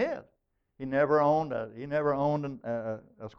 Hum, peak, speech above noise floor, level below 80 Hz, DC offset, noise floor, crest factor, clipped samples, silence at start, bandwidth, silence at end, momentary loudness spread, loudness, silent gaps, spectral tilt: none; -14 dBFS; 46 dB; -62 dBFS; under 0.1%; -76 dBFS; 16 dB; under 0.1%; 0 s; 6.4 kHz; 0.1 s; 15 LU; -29 LUFS; none; -8.5 dB/octave